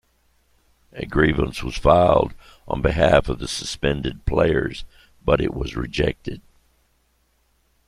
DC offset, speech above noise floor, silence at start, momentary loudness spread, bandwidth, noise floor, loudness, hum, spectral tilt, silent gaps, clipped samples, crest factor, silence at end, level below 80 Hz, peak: under 0.1%; 44 dB; 0.95 s; 15 LU; 13.5 kHz; -65 dBFS; -21 LUFS; none; -6 dB/octave; none; under 0.1%; 20 dB; 1.5 s; -34 dBFS; -2 dBFS